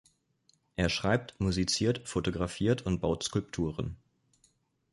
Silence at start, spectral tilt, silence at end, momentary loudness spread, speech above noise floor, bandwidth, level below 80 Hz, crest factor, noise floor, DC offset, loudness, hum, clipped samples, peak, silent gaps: 0.8 s; -5 dB/octave; 0.95 s; 8 LU; 40 dB; 11.5 kHz; -48 dBFS; 20 dB; -71 dBFS; under 0.1%; -31 LUFS; none; under 0.1%; -14 dBFS; none